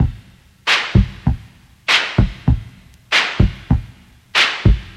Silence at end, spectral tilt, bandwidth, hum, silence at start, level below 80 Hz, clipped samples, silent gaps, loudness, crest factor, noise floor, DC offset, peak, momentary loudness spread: 0.05 s; -4.5 dB/octave; 12.5 kHz; none; 0 s; -24 dBFS; under 0.1%; none; -17 LUFS; 16 dB; -45 dBFS; under 0.1%; 0 dBFS; 9 LU